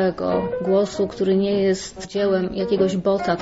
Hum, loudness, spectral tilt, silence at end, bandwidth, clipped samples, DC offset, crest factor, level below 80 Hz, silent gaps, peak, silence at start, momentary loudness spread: none; -21 LUFS; -6 dB/octave; 0 s; 8 kHz; under 0.1%; 0.1%; 12 dB; -50 dBFS; none; -8 dBFS; 0 s; 4 LU